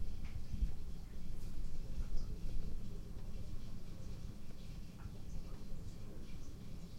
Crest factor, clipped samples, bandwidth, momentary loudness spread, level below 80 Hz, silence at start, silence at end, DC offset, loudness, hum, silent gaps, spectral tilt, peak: 14 dB; under 0.1%; 8 kHz; 7 LU; -44 dBFS; 0 s; 0 s; under 0.1%; -50 LUFS; none; none; -6.5 dB/octave; -24 dBFS